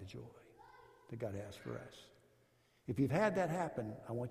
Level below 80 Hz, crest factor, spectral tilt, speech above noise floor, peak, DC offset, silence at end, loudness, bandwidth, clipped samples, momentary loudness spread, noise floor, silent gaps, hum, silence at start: -70 dBFS; 20 dB; -7 dB/octave; 33 dB; -22 dBFS; under 0.1%; 0 s; -40 LUFS; 15 kHz; under 0.1%; 24 LU; -73 dBFS; none; none; 0 s